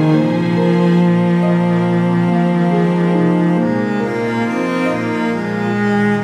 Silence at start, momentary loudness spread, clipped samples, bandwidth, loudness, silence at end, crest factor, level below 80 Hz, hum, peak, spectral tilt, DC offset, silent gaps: 0 s; 5 LU; under 0.1%; 8.4 kHz; -15 LUFS; 0 s; 12 dB; -54 dBFS; none; -2 dBFS; -8.5 dB/octave; under 0.1%; none